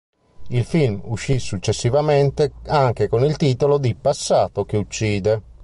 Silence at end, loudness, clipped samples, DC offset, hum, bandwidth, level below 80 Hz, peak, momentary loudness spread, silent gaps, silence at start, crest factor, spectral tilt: 0 s; -20 LUFS; under 0.1%; under 0.1%; none; 11.5 kHz; -42 dBFS; -4 dBFS; 6 LU; none; 0.4 s; 14 dB; -6 dB/octave